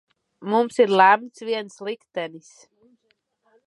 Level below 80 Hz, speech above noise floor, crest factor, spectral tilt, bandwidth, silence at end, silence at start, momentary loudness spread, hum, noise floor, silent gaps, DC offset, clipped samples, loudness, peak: -80 dBFS; 49 dB; 22 dB; -4.5 dB/octave; 11.5 kHz; 1.3 s; 0.4 s; 17 LU; none; -70 dBFS; none; under 0.1%; under 0.1%; -21 LUFS; -2 dBFS